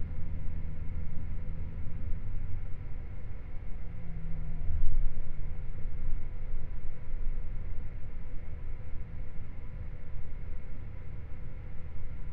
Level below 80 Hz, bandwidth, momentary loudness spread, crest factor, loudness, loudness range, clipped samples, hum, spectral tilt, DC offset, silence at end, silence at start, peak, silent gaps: -34 dBFS; 2.5 kHz; 6 LU; 16 dB; -42 LUFS; 5 LU; under 0.1%; none; -10 dB/octave; under 0.1%; 0 s; 0 s; -10 dBFS; none